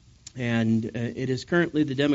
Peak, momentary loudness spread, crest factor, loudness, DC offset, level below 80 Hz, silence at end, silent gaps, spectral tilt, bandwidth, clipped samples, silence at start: -10 dBFS; 8 LU; 16 dB; -26 LUFS; under 0.1%; -58 dBFS; 0 s; none; -5.5 dB/octave; 8 kHz; under 0.1%; 0.35 s